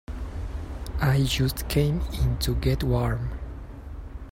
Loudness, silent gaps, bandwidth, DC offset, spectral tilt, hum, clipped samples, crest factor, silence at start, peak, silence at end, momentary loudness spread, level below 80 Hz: -26 LUFS; none; 16 kHz; under 0.1%; -6 dB/octave; none; under 0.1%; 16 dB; 0.1 s; -10 dBFS; 0 s; 17 LU; -32 dBFS